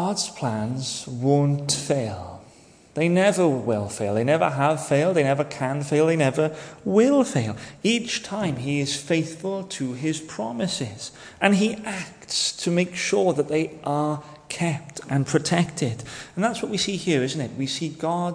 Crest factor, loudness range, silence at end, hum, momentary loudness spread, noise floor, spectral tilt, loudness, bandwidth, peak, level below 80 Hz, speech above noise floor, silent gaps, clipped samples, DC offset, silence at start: 20 dB; 4 LU; 0 s; none; 10 LU; -51 dBFS; -5 dB/octave; -24 LUFS; 10.5 kHz; -4 dBFS; -60 dBFS; 28 dB; none; under 0.1%; under 0.1%; 0 s